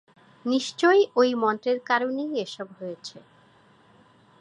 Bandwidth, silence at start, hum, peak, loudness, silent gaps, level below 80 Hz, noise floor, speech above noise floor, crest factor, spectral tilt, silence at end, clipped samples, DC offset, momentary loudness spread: 11 kHz; 0.45 s; none; -6 dBFS; -24 LUFS; none; -80 dBFS; -57 dBFS; 33 dB; 20 dB; -4 dB/octave; 1.2 s; under 0.1%; under 0.1%; 17 LU